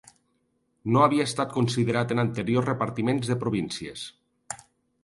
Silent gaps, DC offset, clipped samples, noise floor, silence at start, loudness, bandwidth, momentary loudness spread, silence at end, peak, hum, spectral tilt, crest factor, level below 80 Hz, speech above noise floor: none; under 0.1%; under 0.1%; -72 dBFS; 0.85 s; -25 LUFS; 11.5 kHz; 18 LU; 0.5 s; -6 dBFS; none; -6 dB/octave; 20 dB; -60 dBFS; 47 dB